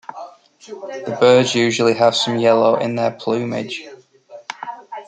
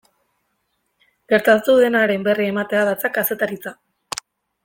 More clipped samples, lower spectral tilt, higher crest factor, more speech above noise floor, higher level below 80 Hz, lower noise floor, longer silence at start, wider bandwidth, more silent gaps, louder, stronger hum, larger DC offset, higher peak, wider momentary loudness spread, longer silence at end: neither; about the same, -4.5 dB/octave vs -4.5 dB/octave; about the same, 16 dB vs 18 dB; second, 26 dB vs 53 dB; about the same, -64 dBFS vs -64 dBFS; second, -42 dBFS vs -71 dBFS; second, 0.1 s vs 1.3 s; second, 9.4 kHz vs 17 kHz; neither; about the same, -16 LUFS vs -18 LUFS; neither; neither; about the same, -2 dBFS vs -2 dBFS; first, 20 LU vs 16 LU; second, 0.05 s vs 0.9 s